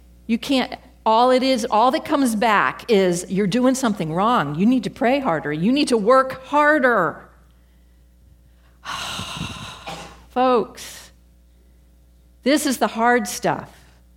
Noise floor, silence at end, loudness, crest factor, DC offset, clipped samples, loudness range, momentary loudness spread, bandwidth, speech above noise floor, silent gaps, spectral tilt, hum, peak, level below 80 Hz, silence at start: -52 dBFS; 0.5 s; -19 LUFS; 18 dB; under 0.1%; under 0.1%; 8 LU; 15 LU; 16.5 kHz; 33 dB; none; -4.5 dB/octave; none; -2 dBFS; -52 dBFS; 0.3 s